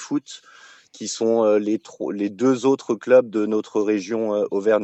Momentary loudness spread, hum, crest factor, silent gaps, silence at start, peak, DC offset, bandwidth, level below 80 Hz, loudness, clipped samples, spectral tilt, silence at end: 12 LU; none; 16 dB; none; 0 s; -4 dBFS; under 0.1%; 8.4 kHz; -84 dBFS; -21 LUFS; under 0.1%; -5 dB/octave; 0 s